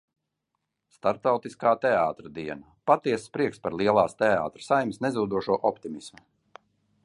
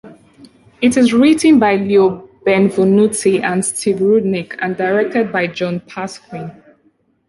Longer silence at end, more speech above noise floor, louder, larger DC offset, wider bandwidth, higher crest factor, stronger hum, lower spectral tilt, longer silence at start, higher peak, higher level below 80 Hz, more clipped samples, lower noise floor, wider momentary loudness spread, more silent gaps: first, 0.95 s vs 0.8 s; first, 56 dB vs 44 dB; second, -26 LUFS vs -14 LUFS; neither; about the same, 11.5 kHz vs 11.5 kHz; first, 20 dB vs 14 dB; neither; about the same, -6 dB/octave vs -5 dB/octave; first, 1.05 s vs 0.05 s; second, -6 dBFS vs -2 dBFS; second, -64 dBFS vs -56 dBFS; neither; first, -81 dBFS vs -58 dBFS; about the same, 14 LU vs 16 LU; neither